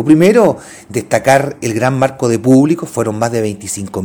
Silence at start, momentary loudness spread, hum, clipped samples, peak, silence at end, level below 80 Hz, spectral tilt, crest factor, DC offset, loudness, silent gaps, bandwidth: 0 s; 12 LU; none; 0.2%; 0 dBFS; 0 s; -50 dBFS; -6 dB/octave; 12 dB; under 0.1%; -13 LUFS; none; over 20 kHz